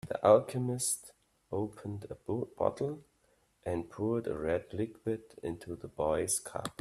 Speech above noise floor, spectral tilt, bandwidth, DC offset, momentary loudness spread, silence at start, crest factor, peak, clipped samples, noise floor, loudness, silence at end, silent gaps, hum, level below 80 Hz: 38 dB; -5 dB/octave; 15 kHz; under 0.1%; 16 LU; 0.05 s; 22 dB; -12 dBFS; under 0.1%; -71 dBFS; -34 LUFS; 0.1 s; none; none; -62 dBFS